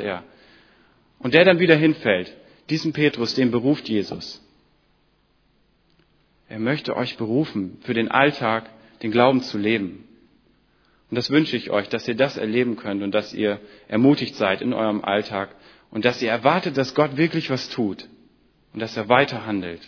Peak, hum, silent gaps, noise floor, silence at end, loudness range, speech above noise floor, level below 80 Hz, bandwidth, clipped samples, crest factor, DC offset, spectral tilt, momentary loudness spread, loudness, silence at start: 0 dBFS; none; none; -63 dBFS; 0.1 s; 7 LU; 42 dB; -62 dBFS; 5.4 kHz; under 0.1%; 22 dB; under 0.1%; -6.5 dB/octave; 13 LU; -21 LUFS; 0 s